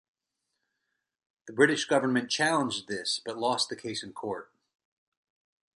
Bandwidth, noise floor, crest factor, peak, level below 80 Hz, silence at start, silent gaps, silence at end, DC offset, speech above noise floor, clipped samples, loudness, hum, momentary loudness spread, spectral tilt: 11.5 kHz; -83 dBFS; 24 dB; -8 dBFS; -74 dBFS; 1.45 s; none; 1.3 s; under 0.1%; 54 dB; under 0.1%; -28 LUFS; none; 12 LU; -3 dB/octave